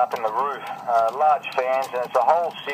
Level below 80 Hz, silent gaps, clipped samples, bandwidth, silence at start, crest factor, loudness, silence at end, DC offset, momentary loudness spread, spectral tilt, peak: -80 dBFS; none; under 0.1%; 15.5 kHz; 0 s; 18 dB; -22 LUFS; 0 s; under 0.1%; 6 LU; -3.5 dB/octave; -4 dBFS